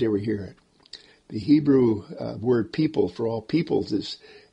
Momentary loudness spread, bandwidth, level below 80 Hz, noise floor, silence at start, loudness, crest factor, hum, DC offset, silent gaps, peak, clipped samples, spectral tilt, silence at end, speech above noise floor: 22 LU; 8.4 kHz; -58 dBFS; -48 dBFS; 0 s; -24 LUFS; 16 dB; none; under 0.1%; none; -8 dBFS; under 0.1%; -8 dB/octave; 0.2 s; 25 dB